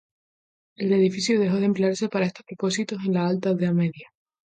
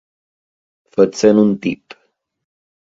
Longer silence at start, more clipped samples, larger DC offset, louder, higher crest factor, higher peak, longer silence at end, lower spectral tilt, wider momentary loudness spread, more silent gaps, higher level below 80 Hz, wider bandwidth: second, 0.8 s vs 1 s; neither; neither; second, -24 LUFS vs -15 LUFS; about the same, 14 dB vs 18 dB; second, -10 dBFS vs 0 dBFS; second, 0.5 s vs 1.15 s; about the same, -6 dB/octave vs -6.5 dB/octave; second, 7 LU vs 13 LU; neither; second, -70 dBFS vs -58 dBFS; first, 9.4 kHz vs 7.8 kHz